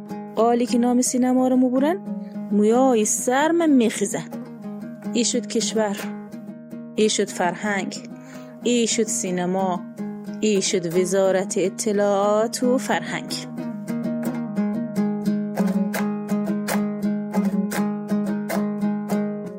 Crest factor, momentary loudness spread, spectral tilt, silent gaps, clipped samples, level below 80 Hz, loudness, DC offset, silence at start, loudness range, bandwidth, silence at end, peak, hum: 16 dB; 13 LU; -4.5 dB/octave; none; under 0.1%; -66 dBFS; -22 LUFS; under 0.1%; 0 s; 5 LU; 16 kHz; 0 s; -6 dBFS; none